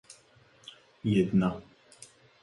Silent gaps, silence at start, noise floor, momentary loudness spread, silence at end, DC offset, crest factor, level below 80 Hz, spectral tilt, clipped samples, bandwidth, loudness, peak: none; 1.05 s; -61 dBFS; 26 LU; 0.8 s; under 0.1%; 18 dB; -58 dBFS; -7.5 dB/octave; under 0.1%; 11.5 kHz; -28 LUFS; -14 dBFS